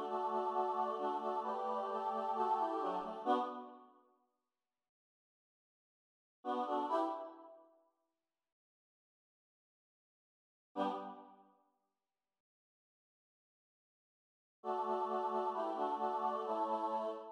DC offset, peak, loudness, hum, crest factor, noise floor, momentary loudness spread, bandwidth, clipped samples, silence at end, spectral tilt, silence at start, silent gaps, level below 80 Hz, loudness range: under 0.1%; -22 dBFS; -39 LUFS; none; 20 dB; under -90 dBFS; 12 LU; 10.5 kHz; under 0.1%; 0 s; -6 dB/octave; 0 s; 4.89-6.43 s, 8.52-10.75 s, 12.40-14.63 s; -90 dBFS; 11 LU